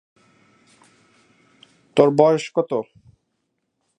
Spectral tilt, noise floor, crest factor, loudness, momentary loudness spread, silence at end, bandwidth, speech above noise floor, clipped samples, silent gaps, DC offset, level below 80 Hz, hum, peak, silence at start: -6.5 dB/octave; -74 dBFS; 24 dB; -19 LUFS; 12 LU; 1.15 s; 10.5 kHz; 57 dB; under 0.1%; none; under 0.1%; -68 dBFS; none; 0 dBFS; 1.95 s